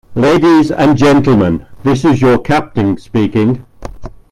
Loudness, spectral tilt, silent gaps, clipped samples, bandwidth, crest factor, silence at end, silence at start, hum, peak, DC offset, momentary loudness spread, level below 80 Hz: -11 LUFS; -7 dB/octave; none; under 0.1%; 12.5 kHz; 10 dB; 0.25 s; 0.1 s; none; 0 dBFS; under 0.1%; 8 LU; -34 dBFS